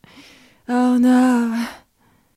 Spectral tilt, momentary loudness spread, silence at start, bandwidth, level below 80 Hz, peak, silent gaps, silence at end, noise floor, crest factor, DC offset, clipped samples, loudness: -5 dB/octave; 15 LU; 0.7 s; 14 kHz; -62 dBFS; -4 dBFS; none; 0.6 s; -59 dBFS; 14 dB; under 0.1%; under 0.1%; -17 LUFS